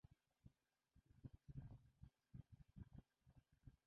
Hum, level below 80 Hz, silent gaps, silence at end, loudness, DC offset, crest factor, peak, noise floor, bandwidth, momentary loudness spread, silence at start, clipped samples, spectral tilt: none; -72 dBFS; none; 0.1 s; -64 LUFS; under 0.1%; 20 dB; -46 dBFS; -83 dBFS; 4.6 kHz; 6 LU; 0.05 s; under 0.1%; -9.5 dB/octave